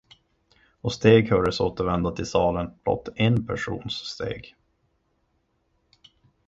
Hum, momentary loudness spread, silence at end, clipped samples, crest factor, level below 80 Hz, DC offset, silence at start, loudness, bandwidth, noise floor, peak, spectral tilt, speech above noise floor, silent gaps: none; 14 LU; 2 s; under 0.1%; 22 dB; -46 dBFS; under 0.1%; 0.85 s; -24 LUFS; 7.8 kHz; -71 dBFS; -2 dBFS; -6.5 dB/octave; 47 dB; none